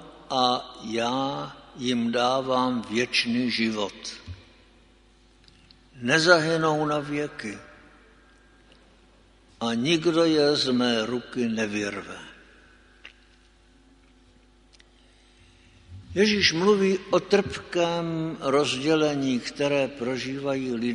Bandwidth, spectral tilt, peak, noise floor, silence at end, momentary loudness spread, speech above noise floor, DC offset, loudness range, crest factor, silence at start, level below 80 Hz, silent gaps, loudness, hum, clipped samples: 10.5 kHz; -4.5 dB/octave; -2 dBFS; -57 dBFS; 0 s; 13 LU; 33 dB; under 0.1%; 8 LU; 24 dB; 0 s; -58 dBFS; none; -24 LUFS; none; under 0.1%